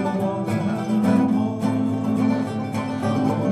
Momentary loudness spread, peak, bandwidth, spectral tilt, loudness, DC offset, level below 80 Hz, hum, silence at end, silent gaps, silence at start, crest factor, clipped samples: 6 LU; -8 dBFS; 13 kHz; -8 dB/octave; -22 LUFS; under 0.1%; -60 dBFS; none; 0 s; none; 0 s; 14 dB; under 0.1%